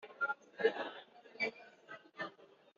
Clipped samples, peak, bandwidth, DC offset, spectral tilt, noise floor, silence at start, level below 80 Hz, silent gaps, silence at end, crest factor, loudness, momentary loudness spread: under 0.1%; -20 dBFS; 7.2 kHz; under 0.1%; -0.5 dB/octave; -61 dBFS; 0 s; under -90 dBFS; none; 0.35 s; 22 dB; -40 LUFS; 19 LU